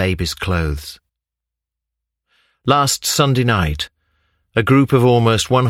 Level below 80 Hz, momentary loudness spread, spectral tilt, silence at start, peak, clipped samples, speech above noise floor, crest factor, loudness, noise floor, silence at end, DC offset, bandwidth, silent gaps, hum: -34 dBFS; 13 LU; -5 dB/octave; 0 s; 0 dBFS; under 0.1%; 69 dB; 18 dB; -16 LUFS; -84 dBFS; 0 s; under 0.1%; 16.5 kHz; none; none